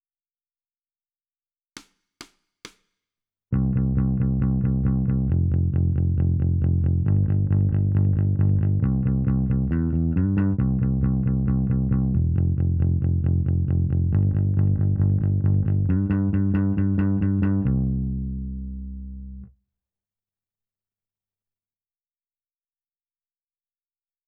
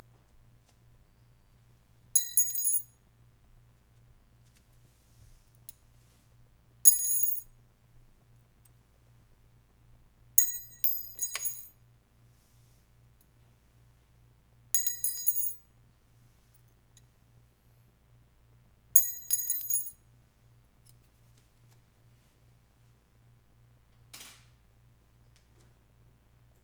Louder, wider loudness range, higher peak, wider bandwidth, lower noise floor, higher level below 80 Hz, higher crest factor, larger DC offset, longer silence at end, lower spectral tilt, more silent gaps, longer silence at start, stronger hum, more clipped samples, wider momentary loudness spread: first, -22 LUFS vs -26 LUFS; about the same, 8 LU vs 9 LU; second, -10 dBFS vs -2 dBFS; second, 6.2 kHz vs over 20 kHz; first, under -90 dBFS vs -64 dBFS; first, -34 dBFS vs -66 dBFS; second, 12 dB vs 34 dB; neither; first, 4.8 s vs 2.35 s; first, -11 dB/octave vs 1 dB/octave; neither; second, 1.75 s vs 2.15 s; neither; neither; second, 4 LU vs 28 LU